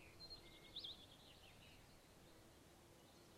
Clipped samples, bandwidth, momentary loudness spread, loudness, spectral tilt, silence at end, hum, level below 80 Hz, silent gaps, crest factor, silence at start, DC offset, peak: under 0.1%; 15.5 kHz; 14 LU; -59 LUFS; -3 dB/octave; 0 s; none; -74 dBFS; none; 20 dB; 0 s; under 0.1%; -42 dBFS